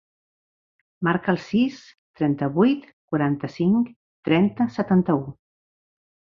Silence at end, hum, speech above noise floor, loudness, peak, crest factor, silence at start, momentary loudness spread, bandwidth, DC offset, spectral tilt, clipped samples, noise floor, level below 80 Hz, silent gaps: 1 s; none; over 69 dB; -23 LUFS; -6 dBFS; 18 dB; 1 s; 8 LU; 7 kHz; under 0.1%; -8.5 dB/octave; under 0.1%; under -90 dBFS; -60 dBFS; 1.98-2.14 s, 2.93-3.08 s, 3.96-4.23 s